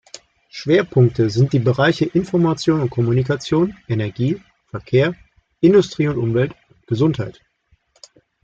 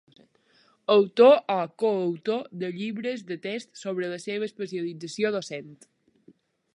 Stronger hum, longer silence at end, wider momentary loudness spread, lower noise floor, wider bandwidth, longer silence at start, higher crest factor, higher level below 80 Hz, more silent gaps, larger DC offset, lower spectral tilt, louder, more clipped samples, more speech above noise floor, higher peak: neither; about the same, 1.1 s vs 1 s; second, 13 LU vs 16 LU; about the same, -61 dBFS vs -63 dBFS; second, 7.8 kHz vs 11 kHz; second, 0.55 s vs 0.9 s; about the same, 16 dB vs 20 dB; first, -50 dBFS vs -82 dBFS; neither; neither; first, -7.5 dB/octave vs -5.5 dB/octave; first, -18 LUFS vs -26 LUFS; neither; first, 44 dB vs 38 dB; first, -2 dBFS vs -6 dBFS